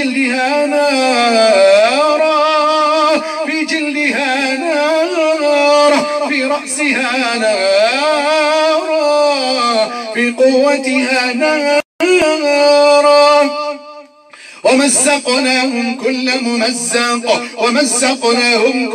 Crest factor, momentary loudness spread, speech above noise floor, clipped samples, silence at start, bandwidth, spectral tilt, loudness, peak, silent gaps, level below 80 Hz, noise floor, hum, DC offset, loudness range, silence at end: 12 dB; 7 LU; 26 dB; under 0.1%; 0 s; 14.5 kHz; -1.5 dB/octave; -12 LUFS; 0 dBFS; 11.85-11.99 s; -62 dBFS; -38 dBFS; none; under 0.1%; 2 LU; 0 s